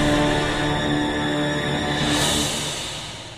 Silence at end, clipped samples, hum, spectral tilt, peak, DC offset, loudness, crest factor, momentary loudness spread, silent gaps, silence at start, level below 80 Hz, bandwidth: 0 s; under 0.1%; none; -3.5 dB/octave; -8 dBFS; 0.1%; -22 LUFS; 14 dB; 7 LU; none; 0 s; -36 dBFS; 15.5 kHz